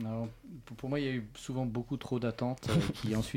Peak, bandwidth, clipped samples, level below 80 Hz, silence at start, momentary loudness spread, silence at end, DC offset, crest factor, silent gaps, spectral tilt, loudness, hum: -18 dBFS; 16.5 kHz; under 0.1%; -54 dBFS; 0 s; 11 LU; 0 s; under 0.1%; 16 dB; none; -6.5 dB/octave; -35 LUFS; none